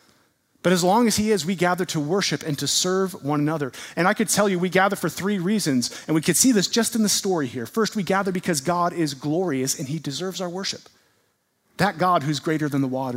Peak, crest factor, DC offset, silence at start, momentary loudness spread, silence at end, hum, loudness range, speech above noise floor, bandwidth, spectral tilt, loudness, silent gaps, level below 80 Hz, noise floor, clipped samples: -4 dBFS; 20 dB; under 0.1%; 0.65 s; 9 LU; 0 s; none; 5 LU; 46 dB; 16 kHz; -4 dB/octave; -22 LUFS; none; -60 dBFS; -68 dBFS; under 0.1%